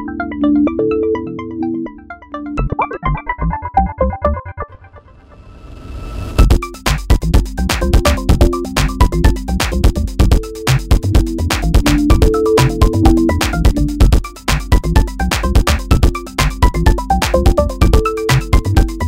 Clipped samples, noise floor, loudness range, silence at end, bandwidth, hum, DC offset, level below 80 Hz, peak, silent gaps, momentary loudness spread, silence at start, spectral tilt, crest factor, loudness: under 0.1%; -40 dBFS; 6 LU; 0 s; 16.5 kHz; none; under 0.1%; -16 dBFS; 0 dBFS; none; 9 LU; 0 s; -6 dB/octave; 14 dB; -15 LUFS